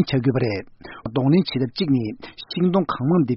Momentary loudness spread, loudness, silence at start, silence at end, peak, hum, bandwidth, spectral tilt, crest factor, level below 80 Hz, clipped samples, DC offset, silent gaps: 13 LU; -22 LUFS; 0 s; 0 s; -6 dBFS; none; 6 kHz; -6.5 dB/octave; 14 dB; -52 dBFS; under 0.1%; under 0.1%; none